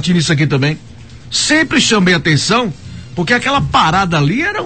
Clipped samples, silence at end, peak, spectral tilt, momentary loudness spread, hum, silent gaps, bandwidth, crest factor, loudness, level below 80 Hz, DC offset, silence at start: under 0.1%; 0 s; 0 dBFS; -4 dB/octave; 11 LU; none; none; 9 kHz; 14 dB; -13 LUFS; -38 dBFS; 0.8%; 0 s